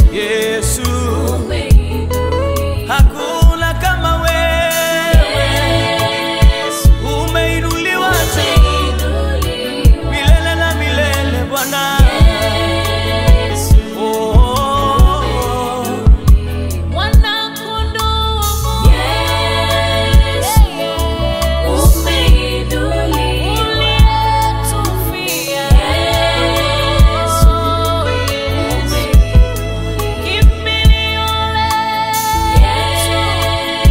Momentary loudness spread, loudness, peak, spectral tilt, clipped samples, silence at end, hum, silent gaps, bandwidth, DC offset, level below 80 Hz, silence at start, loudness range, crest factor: 5 LU; -13 LUFS; 0 dBFS; -4.5 dB/octave; under 0.1%; 0 s; none; none; 16.5 kHz; under 0.1%; -14 dBFS; 0 s; 1 LU; 12 dB